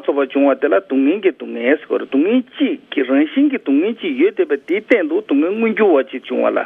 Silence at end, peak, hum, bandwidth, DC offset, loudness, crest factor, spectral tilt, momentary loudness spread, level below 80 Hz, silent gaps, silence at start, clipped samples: 0 s; 0 dBFS; none; 3.8 kHz; under 0.1%; -16 LUFS; 16 dB; -7.5 dB/octave; 5 LU; -70 dBFS; none; 0.05 s; under 0.1%